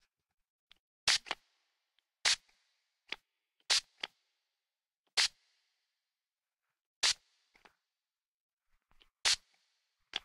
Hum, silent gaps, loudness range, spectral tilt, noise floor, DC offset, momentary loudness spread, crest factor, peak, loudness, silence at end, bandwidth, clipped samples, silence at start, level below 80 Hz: none; 4.96-5.04 s, 6.86-7.02 s, 8.28-8.57 s; 4 LU; 3 dB/octave; under -90 dBFS; under 0.1%; 15 LU; 28 dB; -12 dBFS; -32 LUFS; 0.05 s; 16 kHz; under 0.1%; 1.05 s; -74 dBFS